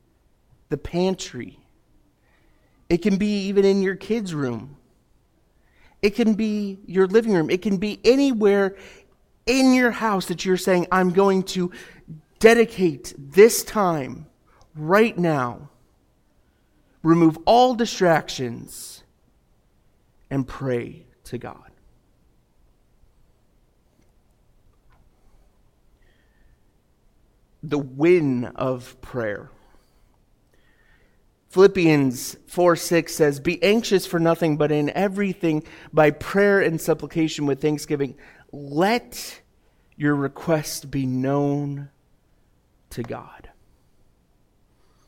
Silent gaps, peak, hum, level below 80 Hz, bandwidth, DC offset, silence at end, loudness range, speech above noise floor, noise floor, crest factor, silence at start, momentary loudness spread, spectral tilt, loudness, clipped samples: none; -2 dBFS; none; -52 dBFS; 17 kHz; under 0.1%; 1.7 s; 12 LU; 41 dB; -61 dBFS; 22 dB; 0.7 s; 18 LU; -5.5 dB/octave; -21 LUFS; under 0.1%